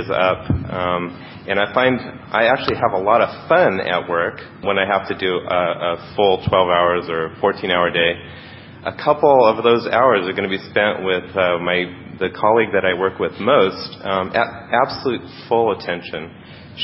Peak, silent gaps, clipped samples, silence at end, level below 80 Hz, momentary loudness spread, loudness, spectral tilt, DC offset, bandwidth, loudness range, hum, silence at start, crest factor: 0 dBFS; none; under 0.1%; 0 s; -44 dBFS; 11 LU; -18 LUFS; -10 dB/octave; under 0.1%; 5.8 kHz; 2 LU; none; 0 s; 18 dB